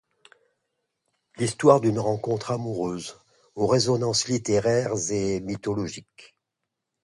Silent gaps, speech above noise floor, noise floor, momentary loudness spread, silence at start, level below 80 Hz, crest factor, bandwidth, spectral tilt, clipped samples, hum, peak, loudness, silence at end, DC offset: none; 59 dB; -83 dBFS; 12 LU; 1.4 s; -58 dBFS; 22 dB; 11.5 kHz; -5 dB/octave; under 0.1%; none; -4 dBFS; -24 LUFS; 0.8 s; under 0.1%